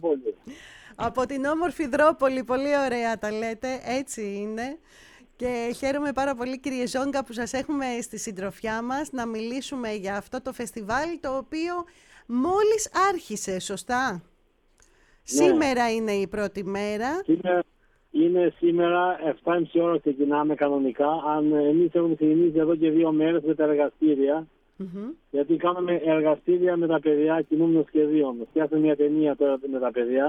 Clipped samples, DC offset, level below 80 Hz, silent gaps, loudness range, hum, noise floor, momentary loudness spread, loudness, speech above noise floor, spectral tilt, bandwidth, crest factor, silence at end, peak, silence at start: under 0.1%; under 0.1%; -58 dBFS; none; 8 LU; none; -63 dBFS; 11 LU; -25 LUFS; 39 dB; -5 dB/octave; 13.5 kHz; 16 dB; 0 s; -8 dBFS; 0 s